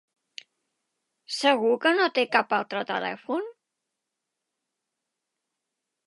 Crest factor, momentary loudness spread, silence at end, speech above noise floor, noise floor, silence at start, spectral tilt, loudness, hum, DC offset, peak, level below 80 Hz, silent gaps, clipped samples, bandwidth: 24 dB; 23 LU; 2.55 s; 60 dB; -84 dBFS; 1.3 s; -3 dB/octave; -25 LUFS; none; under 0.1%; -6 dBFS; -86 dBFS; none; under 0.1%; 11.5 kHz